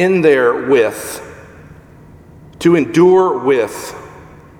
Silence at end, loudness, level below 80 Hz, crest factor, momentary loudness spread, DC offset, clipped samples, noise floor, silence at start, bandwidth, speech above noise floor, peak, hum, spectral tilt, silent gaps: 0.35 s; -13 LUFS; -50 dBFS; 14 dB; 19 LU; under 0.1%; under 0.1%; -40 dBFS; 0 s; 17 kHz; 28 dB; 0 dBFS; none; -6 dB/octave; none